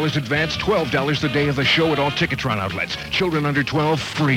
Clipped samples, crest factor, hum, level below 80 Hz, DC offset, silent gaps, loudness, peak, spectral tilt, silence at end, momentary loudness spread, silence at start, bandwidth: under 0.1%; 14 dB; none; -44 dBFS; under 0.1%; none; -20 LUFS; -6 dBFS; -5.5 dB/octave; 0 s; 5 LU; 0 s; 16 kHz